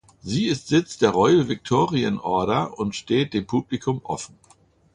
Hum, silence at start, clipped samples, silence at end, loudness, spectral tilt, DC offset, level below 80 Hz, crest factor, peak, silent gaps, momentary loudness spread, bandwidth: none; 0.25 s; under 0.1%; 0.7 s; -22 LUFS; -6 dB/octave; under 0.1%; -54 dBFS; 18 dB; -4 dBFS; none; 10 LU; 11 kHz